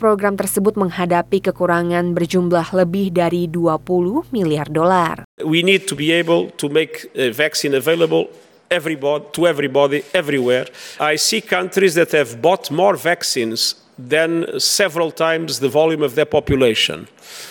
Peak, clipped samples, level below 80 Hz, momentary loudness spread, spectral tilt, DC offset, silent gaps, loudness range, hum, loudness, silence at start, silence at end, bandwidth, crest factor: 0 dBFS; under 0.1%; -50 dBFS; 5 LU; -4 dB/octave; under 0.1%; 5.24-5.38 s; 1 LU; none; -17 LUFS; 0 s; 0 s; 19.5 kHz; 16 dB